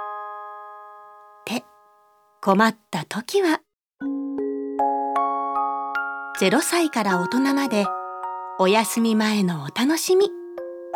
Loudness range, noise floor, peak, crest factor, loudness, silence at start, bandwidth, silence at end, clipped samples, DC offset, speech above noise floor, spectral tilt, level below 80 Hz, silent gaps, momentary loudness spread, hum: 4 LU; -58 dBFS; -2 dBFS; 20 dB; -22 LUFS; 0 s; 19 kHz; 0 s; under 0.1%; under 0.1%; 38 dB; -4.5 dB/octave; -74 dBFS; none; 15 LU; none